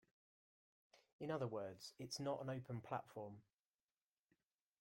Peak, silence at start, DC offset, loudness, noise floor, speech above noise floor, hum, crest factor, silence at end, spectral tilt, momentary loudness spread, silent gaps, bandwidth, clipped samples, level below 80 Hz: -30 dBFS; 0.95 s; under 0.1%; -49 LUFS; under -90 dBFS; over 42 dB; none; 20 dB; 1.4 s; -5.5 dB/octave; 9 LU; 1.12-1.19 s; 16.5 kHz; under 0.1%; -84 dBFS